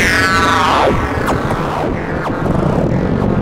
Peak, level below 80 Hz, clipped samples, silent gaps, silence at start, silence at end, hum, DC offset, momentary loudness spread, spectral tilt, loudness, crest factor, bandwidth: -2 dBFS; -26 dBFS; under 0.1%; none; 0 s; 0 s; none; under 0.1%; 7 LU; -5.5 dB/octave; -14 LUFS; 12 dB; 16 kHz